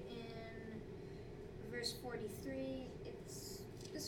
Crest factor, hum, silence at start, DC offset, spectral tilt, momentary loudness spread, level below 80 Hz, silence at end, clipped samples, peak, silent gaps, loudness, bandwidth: 20 dB; none; 0 s; under 0.1%; -4.5 dB/octave; 9 LU; -62 dBFS; 0 s; under 0.1%; -28 dBFS; none; -48 LUFS; 19 kHz